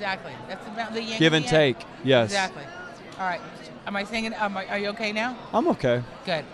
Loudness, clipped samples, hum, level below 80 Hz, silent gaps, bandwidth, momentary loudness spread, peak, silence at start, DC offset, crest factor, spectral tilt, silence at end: -25 LUFS; under 0.1%; none; -54 dBFS; none; 12 kHz; 16 LU; -4 dBFS; 0 s; under 0.1%; 22 dB; -5 dB/octave; 0 s